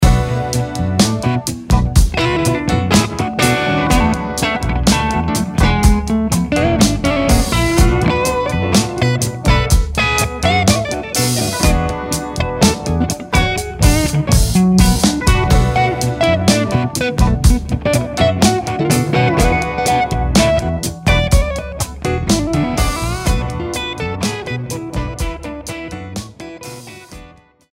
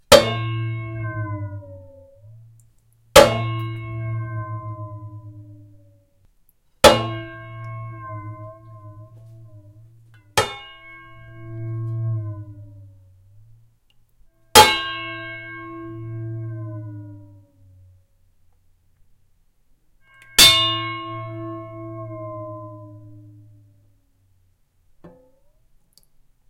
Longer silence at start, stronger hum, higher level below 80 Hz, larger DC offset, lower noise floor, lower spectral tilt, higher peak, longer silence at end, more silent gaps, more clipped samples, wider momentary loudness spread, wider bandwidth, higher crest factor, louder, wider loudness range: about the same, 0 s vs 0.1 s; neither; first, -20 dBFS vs -46 dBFS; neither; second, -43 dBFS vs -61 dBFS; first, -5 dB/octave vs -3 dB/octave; about the same, 0 dBFS vs 0 dBFS; second, 0.45 s vs 1.4 s; neither; neither; second, 9 LU vs 28 LU; about the same, 16.5 kHz vs 16.5 kHz; second, 14 dB vs 24 dB; first, -15 LUFS vs -18 LUFS; second, 5 LU vs 18 LU